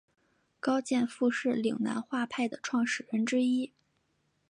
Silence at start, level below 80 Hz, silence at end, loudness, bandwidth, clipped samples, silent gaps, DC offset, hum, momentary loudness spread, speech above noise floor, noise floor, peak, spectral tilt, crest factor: 0.65 s; -80 dBFS; 0.8 s; -31 LUFS; 10.5 kHz; under 0.1%; none; under 0.1%; none; 5 LU; 45 dB; -75 dBFS; -16 dBFS; -4.5 dB/octave; 16 dB